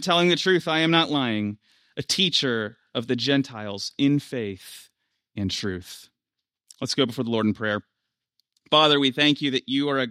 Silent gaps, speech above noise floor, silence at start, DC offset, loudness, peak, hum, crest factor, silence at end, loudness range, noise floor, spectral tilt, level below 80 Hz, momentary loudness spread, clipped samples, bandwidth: none; 63 dB; 0 s; under 0.1%; -23 LUFS; -4 dBFS; none; 22 dB; 0 s; 7 LU; -86 dBFS; -4.5 dB/octave; -66 dBFS; 16 LU; under 0.1%; 15 kHz